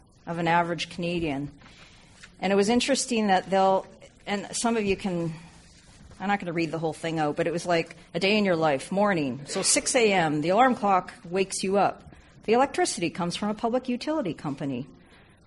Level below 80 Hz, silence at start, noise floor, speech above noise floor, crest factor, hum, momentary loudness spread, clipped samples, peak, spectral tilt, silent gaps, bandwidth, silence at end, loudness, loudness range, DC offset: -56 dBFS; 0.25 s; -54 dBFS; 29 dB; 18 dB; none; 11 LU; under 0.1%; -8 dBFS; -4 dB/octave; none; 11.5 kHz; 0.55 s; -26 LUFS; 5 LU; under 0.1%